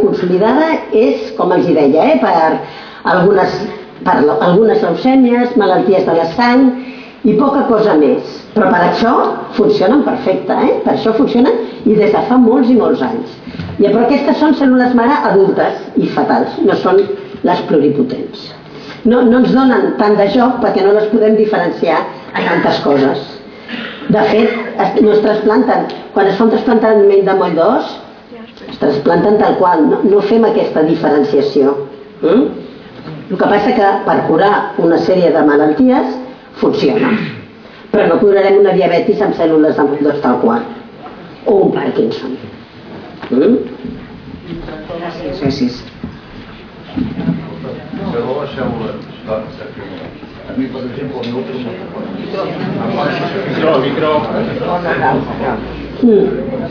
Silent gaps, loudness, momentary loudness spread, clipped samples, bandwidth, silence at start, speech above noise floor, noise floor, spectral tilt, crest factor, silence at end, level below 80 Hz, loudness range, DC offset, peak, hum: none; -12 LUFS; 17 LU; under 0.1%; 5.4 kHz; 0 s; 23 dB; -35 dBFS; -8 dB/octave; 12 dB; 0 s; -44 dBFS; 10 LU; under 0.1%; 0 dBFS; none